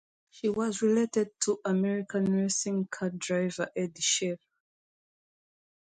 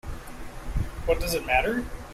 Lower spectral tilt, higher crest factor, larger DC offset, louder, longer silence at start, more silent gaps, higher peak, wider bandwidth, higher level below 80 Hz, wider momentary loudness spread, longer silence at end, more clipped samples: about the same, -4 dB/octave vs -4.5 dB/octave; about the same, 18 dB vs 20 dB; neither; about the same, -29 LUFS vs -27 LUFS; first, 0.35 s vs 0.05 s; neither; second, -14 dBFS vs -8 dBFS; second, 9.6 kHz vs 16 kHz; second, -72 dBFS vs -34 dBFS; second, 7 LU vs 17 LU; first, 1.6 s vs 0 s; neither